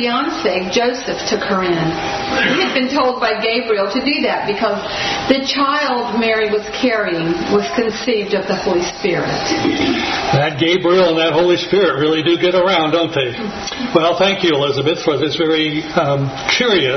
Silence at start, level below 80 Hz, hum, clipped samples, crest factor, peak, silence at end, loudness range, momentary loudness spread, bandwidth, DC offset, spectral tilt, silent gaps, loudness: 0 s; -46 dBFS; none; under 0.1%; 16 dB; 0 dBFS; 0 s; 3 LU; 5 LU; 6.4 kHz; under 0.1%; -4.5 dB/octave; none; -16 LUFS